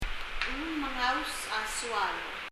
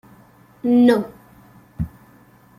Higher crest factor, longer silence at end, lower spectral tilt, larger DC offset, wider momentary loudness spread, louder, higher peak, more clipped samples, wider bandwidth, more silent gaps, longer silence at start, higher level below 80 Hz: about the same, 22 dB vs 18 dB; second, 0 s vs 0.7 s; second, -2 dB/octave vs -7.5 dB/octave; neither; second, 5 LU vs 16 LU; second, -32 LUFS vs -19 LUFS; second, -12 dBFS vs -4 dBFS; neither; about the same, 15.5 kHz vs 14.5 kHz; neither; second, 0 s vs 0.65 s; about the same, -44 dBFS vs -48 dBFS